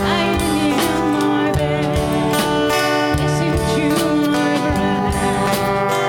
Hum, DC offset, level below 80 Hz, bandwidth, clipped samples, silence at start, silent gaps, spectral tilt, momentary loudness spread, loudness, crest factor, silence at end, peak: none; under 0.1%; -32 dBFS; 17 kHz; under 0.1%; 0 s; none; -5 dB/octave; 2 LU; -17 LUFS; 14 dB; 0 s; -4 dBFS